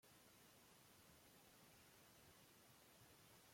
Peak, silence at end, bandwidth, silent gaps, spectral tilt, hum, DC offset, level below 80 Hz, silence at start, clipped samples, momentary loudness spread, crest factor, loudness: -56 dBFS; 0 s; 16.5 kHz; none; -3 dB/octave; none; under 0.1%; -88 dBFS; 0 s; under 0.1%; 1 LU; 14 dB; -68 LUFS